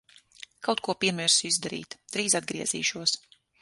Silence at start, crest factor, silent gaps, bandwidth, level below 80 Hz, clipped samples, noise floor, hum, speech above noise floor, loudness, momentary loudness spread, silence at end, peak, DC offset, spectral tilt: 0.6 s; 22 dB; none; 12 kHz; -70 dBFS; under 0.1%; -51 dBFS; none; 23 dB; -26 LUFS; 12 LU; 0.45 s; -8 dBFS; under 0.1%; -1.5 dB/octave